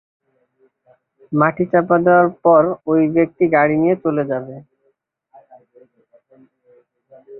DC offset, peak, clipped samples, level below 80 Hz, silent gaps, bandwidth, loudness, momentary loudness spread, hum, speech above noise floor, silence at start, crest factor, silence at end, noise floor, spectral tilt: under 0.1%; -2 dBFS; under 0.1%; -62 dBFS; none; 4 kHz; -16 LUFS; 10 LU; none; 50 dB; 1.3 s; 18 dB; 0 s; -66 dBFS; -13 dB/octave